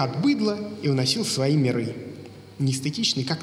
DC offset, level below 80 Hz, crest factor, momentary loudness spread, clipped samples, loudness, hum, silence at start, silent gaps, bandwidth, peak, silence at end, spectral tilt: under 0.1%; -68 dBFS; 16 dB; 15 LU; under 0.1%; -24 LUFS; none; 0 s; none; 15.5 kHz; -8 dBFS; 0 s; -5 dB/octave